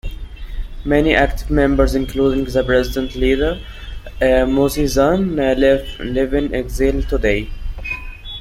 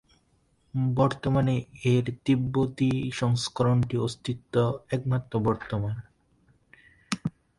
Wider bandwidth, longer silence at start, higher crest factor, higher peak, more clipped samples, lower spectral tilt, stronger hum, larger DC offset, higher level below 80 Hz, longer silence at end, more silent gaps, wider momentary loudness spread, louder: first, 16 kHz vs 11.5 kHz; second, 0.05 s vs 0.75 s; second, 16 dB vs 22 dB; first, -2 dBFS vs -6 dBFS; neither; about the same, -6 dB/octave vs -7 dB/octave; neither; neither; first, -26 dBFS vs -52 dBFS; second, 0 s vs 0.3 s; neither; first, 16 LU vs 8 LU; first, -17 LUFS vs -27 LUFS